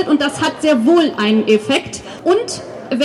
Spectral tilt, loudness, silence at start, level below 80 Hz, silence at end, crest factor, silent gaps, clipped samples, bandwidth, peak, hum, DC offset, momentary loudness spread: -4.5 dB/octave; -15 LUFS; 0 s; -54 dBFS; 0 s; 14 dB; none; under 0.1%; 12 kHz; -2 dBFS; none; under 0.1%; 12 LU